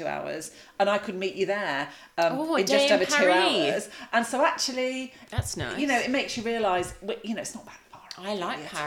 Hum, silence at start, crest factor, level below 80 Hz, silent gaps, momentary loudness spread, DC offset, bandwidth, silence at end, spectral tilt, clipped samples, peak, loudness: none; 0 s; 18 dB; -54 dBFS; none; 14 LU; under 0.1%; 17.5 kHz; 0 s; -3.5 dB/octave; under 0.1%; -8 dBFS; -26 LUFS